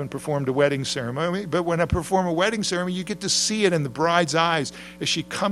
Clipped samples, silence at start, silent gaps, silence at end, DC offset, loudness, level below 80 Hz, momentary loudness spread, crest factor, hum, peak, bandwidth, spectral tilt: under 0.1%; 0 s; none; 0 s; under 0.1%; -23 LUFS; -46 dBFS; 6 LU; 20 dB; none; -4 dBFS; 14.5 kHz; -4 dB/octave